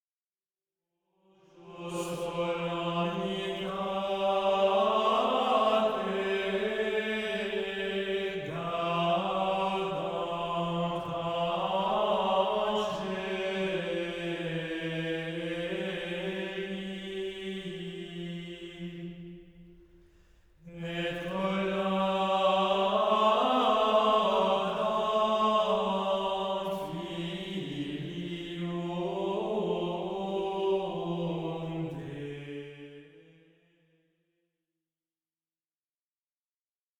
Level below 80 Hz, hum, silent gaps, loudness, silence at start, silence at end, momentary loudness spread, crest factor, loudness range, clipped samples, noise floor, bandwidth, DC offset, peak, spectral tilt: -62 dBFS; none; none; -30 LUFS; 1.55 s; 3.8 s; 13 LU; 18 dB; 13 LU; under 0.1%; under -90 dBFS; 15.5 kHz; under 0.1%; -12 dBFS; -6 dB/octave